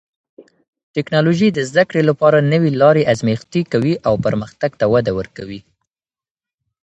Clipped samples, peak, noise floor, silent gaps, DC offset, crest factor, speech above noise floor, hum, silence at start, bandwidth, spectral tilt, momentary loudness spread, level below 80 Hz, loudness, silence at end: under 0.1%; 0 dBFS; under -90 dBFS; 0.68-0.73 s, 0.83-0.94 s; under 0.1%; 16 dB; over 75 dB; none; 0.4 s; 8.2 kHz; -7 dB/octave; 12 LU; -50 dBFS; -16 LUFS; 1.25 s